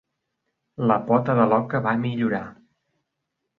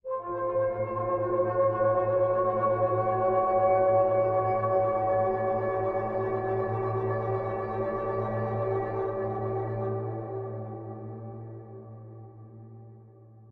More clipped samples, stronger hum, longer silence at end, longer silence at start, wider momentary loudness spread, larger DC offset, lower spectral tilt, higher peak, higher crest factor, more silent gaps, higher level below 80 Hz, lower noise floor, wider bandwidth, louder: neither; neither; first, 1.05 s vs 0 s; first, 0.8 s vs 0.05 s; second, 11 LU vs 18 LU; neither; about the same, -10 dB/octave vs -11 dB/octave; first, -6 dBFS vs -12 dBFS; about the same, 20 dB vs 16 dB; neither; second, -62 dBFS vs -54 dBFS; first, -80 dBFS vs -52 dBFS; about the same, 4.3 kHz vs 4.1 kHz; first, -22 LUFS vs -28 LUFS